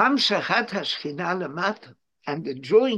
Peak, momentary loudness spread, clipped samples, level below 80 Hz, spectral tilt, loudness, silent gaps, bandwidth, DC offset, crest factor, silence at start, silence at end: -6 dBFS; 12 LU; under 0.1%; -74 dBFS; -4.5 dB/octave; -24 LUFS; none; 10.5 kHz; under 0.1%; 18 dB; 0 s; 0 s